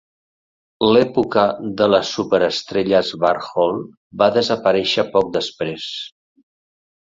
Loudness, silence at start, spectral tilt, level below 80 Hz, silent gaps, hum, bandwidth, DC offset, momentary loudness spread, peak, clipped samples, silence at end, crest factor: -18 LUFS; 0.8 s; -5 dB/octave; -56 dBFS; 3.97-4.10 s; none; 7.8 kHz; under 0.1%; 11 LU; -2 dBFS; under 0.1%; 0.9 s; 18 dB